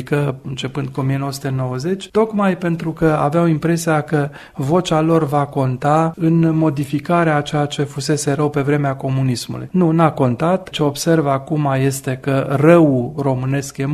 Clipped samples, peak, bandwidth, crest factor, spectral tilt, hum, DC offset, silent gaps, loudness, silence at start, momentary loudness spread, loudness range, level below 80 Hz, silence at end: under 0.1%; 0 dBFS; 13.5 kHz; 16 dB; -6.5 dB/octave; none; under 0.1%; none; -17 LUFS; 0 s; 7 LU; 2 LU; -48 dBFS; 0 s